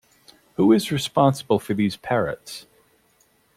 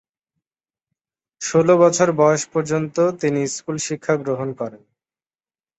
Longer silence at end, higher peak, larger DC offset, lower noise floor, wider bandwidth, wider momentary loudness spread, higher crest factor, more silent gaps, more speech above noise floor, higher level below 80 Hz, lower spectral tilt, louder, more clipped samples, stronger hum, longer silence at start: about the same, 0.95 s vs 1.05 s; about the same, -4 dBFS vs -2 dBFS; neither; second, -62 dBFS vs under -90 dBFS; first, 16 kHz vs 8.4 kHz; first, 17 LU vs 12 LU; about the same, 18 dB vs 18 dB; neither; second, 41 dB vs over 71 dB; about the same, -58 dBFS vs -62 dBFS; about the same, -6 dB/octave vs -5 dB/octave; about the same, -21 LUFS vs -19 LUFS; neither; neither; second, 0.6 s vs 1.4 s